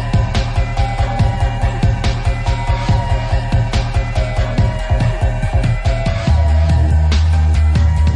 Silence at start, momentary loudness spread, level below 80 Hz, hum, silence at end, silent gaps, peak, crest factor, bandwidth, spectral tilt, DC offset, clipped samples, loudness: 0 s; 5 LU; -16 dBFS; none; 0 s; none; -4 dBFS; 10 dB; 10 kHz; -6.5 dB/octave; under 0.1%; under 0.1%; -16 LUFS